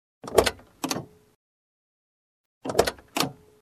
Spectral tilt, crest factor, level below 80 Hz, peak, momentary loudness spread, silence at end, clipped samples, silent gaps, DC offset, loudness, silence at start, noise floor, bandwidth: -3 dB/octave; 28 dB; -50 dBFS; 0 dBFS; 10 LU; 0.3 s; under 0.1%; 1.35-2.61 s; under 0.1%; -27 LUFS; 0.25 s; under -90 dBFS; 14 kHz